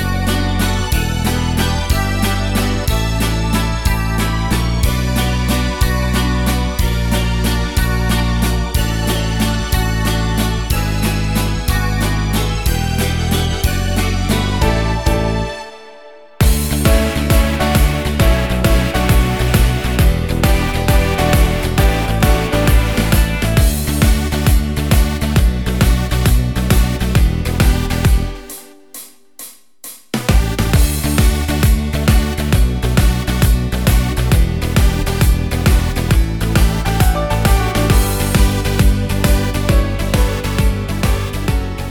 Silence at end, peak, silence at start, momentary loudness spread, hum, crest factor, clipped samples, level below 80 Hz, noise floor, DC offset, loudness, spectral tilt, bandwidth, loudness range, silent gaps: 0 s; 0 dBFS; 0 s; 3 LU; none; 14 dB; under 0.1%; -18 dBFS; -39 dBFS; 1%; -16 LUFS; -5 dB/octave; 19 kHz; 3 LU; none